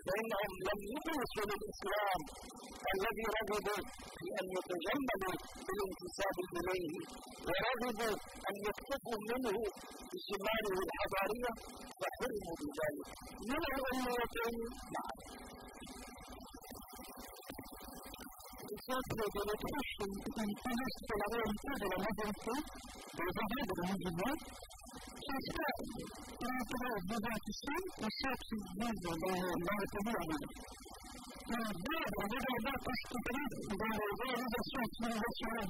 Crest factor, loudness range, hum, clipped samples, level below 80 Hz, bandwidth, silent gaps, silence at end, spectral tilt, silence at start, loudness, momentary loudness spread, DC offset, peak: 16 dB; 4 LU; none; under 0.1%; -58 dBFS; 16 kHz; none; 0 s; -4.5 dB/octave; 0 s; -40 LUFS; 13 LU; under 0.1%; -24 dBFS